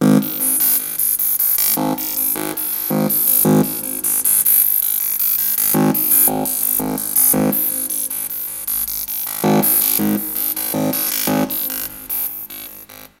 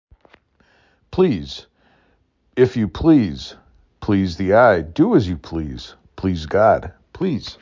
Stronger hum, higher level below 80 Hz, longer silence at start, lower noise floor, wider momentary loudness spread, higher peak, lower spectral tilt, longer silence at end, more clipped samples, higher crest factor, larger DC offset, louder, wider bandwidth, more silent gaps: neither; second, -52 dBFS vs -40 dBFS; second, 0 s vs 1.1 s; second, -38 dBFS vs -62 dBFS; second, 9 LU vs 18 LU; about the same, 0 dBFS vs -2 dBFS; second, -3.5 dB/octave vs -7.5 dB/octave; about the same, 0.15 s vs 0.1 s; neither; about the same, 18 dB vs 18 dB; neither; first, -15 LUFS vs -18 LUFS; first, 17.5 kHz vs 7.6 kHz; neither